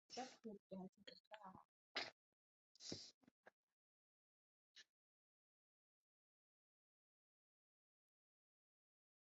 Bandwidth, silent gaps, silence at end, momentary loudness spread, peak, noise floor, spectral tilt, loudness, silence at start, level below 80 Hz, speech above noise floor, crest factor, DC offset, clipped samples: 7.6 kHz; 0.59-0.70 s, 0.89-0.93 s, 1.20-1.31 s, 1.65-1.95 s, 2.12-2.75 s, 3.14-3.21 s, 3.31-3.44 s, 3.53-4.75 s; 4.55 s; 18 LU; -32 dBFS; under -90 dBFS; -2 dB/octave; -56 LUFS; 0.1 s; under -90 dBFS; over 32 dB; 30 dB; under 0.1%; under 0.1%